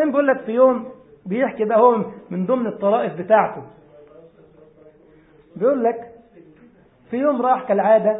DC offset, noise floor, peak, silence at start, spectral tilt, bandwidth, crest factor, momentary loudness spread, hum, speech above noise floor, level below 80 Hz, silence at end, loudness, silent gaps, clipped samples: under 0.1%; -51 dBFS; -2 dBFS; 0 s; -11.5 dB/octave; 3.9 kHz; 18 dB; 13 LU; none; 33 dB; -66 dBFS; 0 s; -19 LUFS; none; under 0.1%